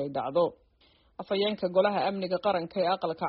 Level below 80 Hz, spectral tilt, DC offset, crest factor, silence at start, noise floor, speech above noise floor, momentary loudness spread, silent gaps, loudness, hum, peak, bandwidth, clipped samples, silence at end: -68 dBFS; -3.5 dB/octave; under 0.1%; 18 dB; 0 s; -64 dBFS; 36 dB; 5 LU; none; -28 LUFS; none; -12 dBFS; 5.8 kHz; under 0.1%; 0 s